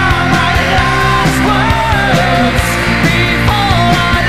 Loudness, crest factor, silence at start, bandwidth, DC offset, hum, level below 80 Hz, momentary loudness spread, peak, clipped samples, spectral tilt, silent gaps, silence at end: -10 LUFS; 10 dB; 0 s; 15.5 kHz; 4%; none; -22 dBFS; 1 LU; 0 dBFS; under 0.1%; -5 dB/octave; none; 0 s